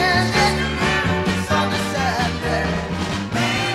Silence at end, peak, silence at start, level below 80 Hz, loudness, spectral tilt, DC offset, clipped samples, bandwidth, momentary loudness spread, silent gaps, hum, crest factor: 0 s; -4 dBFS; 0 s; -34 dBFS; -20 LUFS; -4.5 dB/octave; under 0.1%; under 0.1%; 16 kHz; 6 LU; none; none; 16 dB